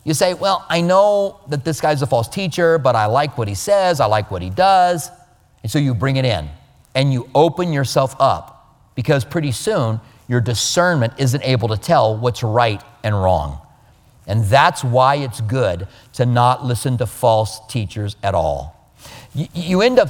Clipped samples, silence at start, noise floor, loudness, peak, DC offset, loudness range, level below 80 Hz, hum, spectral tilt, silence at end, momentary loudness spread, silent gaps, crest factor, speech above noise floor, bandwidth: under 0.1%; 0.05 s; -50 dBFS; -17 LUFS; 0 dBFS; under 0.1%; 3 LU; -44 dBFS; none; -5.5 dB/octave; 0 s; 11 LU; none; 18 dB; 33 dB; 18 kHz